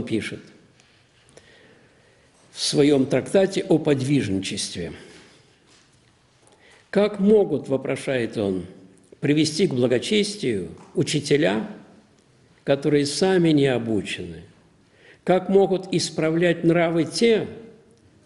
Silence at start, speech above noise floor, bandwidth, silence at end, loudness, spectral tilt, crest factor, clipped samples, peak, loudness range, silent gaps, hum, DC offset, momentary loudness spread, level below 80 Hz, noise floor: 0 s; 37 dB; 11.5 kHz; 0.55 s; -22 LUFS; -5.5 dB/octave; 18 dB; under 0.1%; -4 dBFS; 4 LU; none; none; under 0.1%; 14 LU; -58 dBFS; -58 dBFS